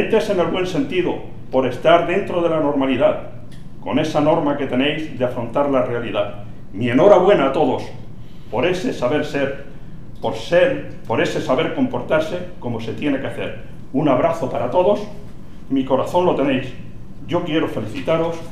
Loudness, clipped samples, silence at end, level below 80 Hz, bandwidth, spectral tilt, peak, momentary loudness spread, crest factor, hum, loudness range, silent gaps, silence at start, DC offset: -19 LUFS; under 0.1%; 0 s; -40 dBFS; 13.5 kHz; -6.5 dB/octave; 0 dBFS; 18 LU; 20 dB; none; 4 LU; none; 0 s; 3%